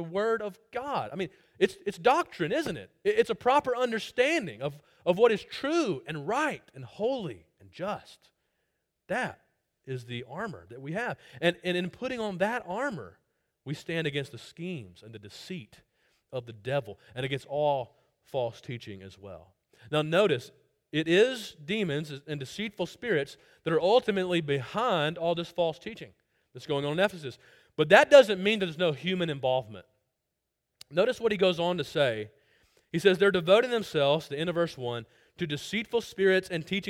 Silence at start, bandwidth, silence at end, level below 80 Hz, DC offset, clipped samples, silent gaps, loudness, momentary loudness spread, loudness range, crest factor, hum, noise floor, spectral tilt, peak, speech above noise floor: 0 s; 16 kHz; 0 s; -68 dBFS; under 0.1%; under 0.1%; none; -28 LUFS; 17 LU; 12 LU; 24 dB; none; -84 dBFS; -5.5 dB/octave; -6 dBFS; 55 dB